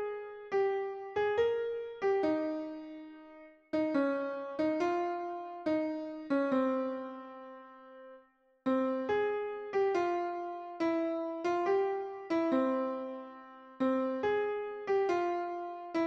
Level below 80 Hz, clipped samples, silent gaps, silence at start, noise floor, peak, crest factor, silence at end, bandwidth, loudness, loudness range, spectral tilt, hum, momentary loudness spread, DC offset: -74 dBFS; under 0.1%; none; 0 s; -64 dBFS; -20 dBFS; 14 dB; 0 s; 7.6 kHz; -33 LUFS; 3 LU; -6 dB/octave; none; 17 LU; under 0.1%